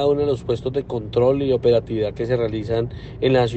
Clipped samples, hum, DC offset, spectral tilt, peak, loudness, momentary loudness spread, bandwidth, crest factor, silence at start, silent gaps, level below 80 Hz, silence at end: under 0.1%; none; under 0.1%; -8 dB/octave; -4 dBFS; -21 LUFS; 7 LU; 8.4 kHz; 16 dB; 0 s; none; -42 dBFS; 0 s